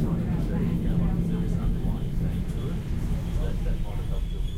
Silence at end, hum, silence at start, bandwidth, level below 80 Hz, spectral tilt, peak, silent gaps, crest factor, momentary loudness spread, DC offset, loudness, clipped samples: 0 s; none; 0 s; 14.5 kHz; -28 dBFS; -8.5 dB/octave; -14 dBFS; none; 12 dB; 6 LU; under 0.1%; -29 LUFS; under 0.1%